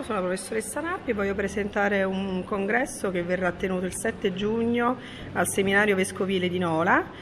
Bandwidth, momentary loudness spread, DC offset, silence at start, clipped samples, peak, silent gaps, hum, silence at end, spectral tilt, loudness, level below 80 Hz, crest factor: 14 kHz; 7 LU; under 0.1%; 0 s; under 0.1%; -6 dBFS; none; none; 0 s; -4.5 dB/octave; -26 LUFS; -50 dBFS; 20 dB